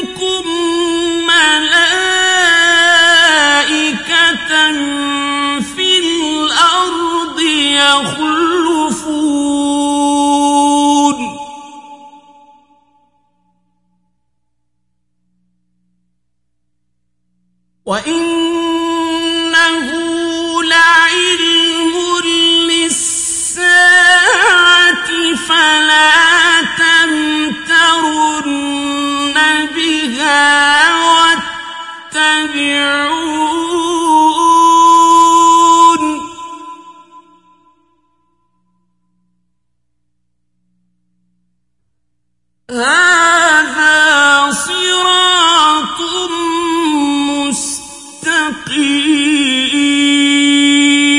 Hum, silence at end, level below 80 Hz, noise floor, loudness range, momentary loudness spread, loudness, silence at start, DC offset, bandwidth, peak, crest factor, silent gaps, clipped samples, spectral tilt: 60 Hz at -60 dBFS; 0 s; -52 dBFS; -71 dBFS; 7 LU; 10 LU; -10 LUFS; 0 s; under 0.1%; 11.5 kHz; 0 dBFS; 12 dB; none; under 0.1%; -1 dB/octave